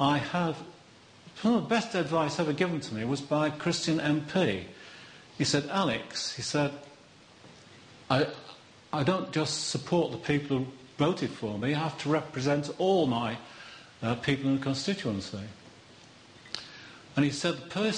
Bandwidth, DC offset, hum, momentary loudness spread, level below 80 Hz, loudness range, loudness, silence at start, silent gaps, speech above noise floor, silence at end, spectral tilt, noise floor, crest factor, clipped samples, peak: 10 kHz; under 0.1%; none; 16 LU; -64 dBFS; 4 LU; -30 LUFS; 0 s; none; 26 dB; 0 s; -5 dB/octave; -55 dBFS; 20 dB; under 0.1%; -12 dBFS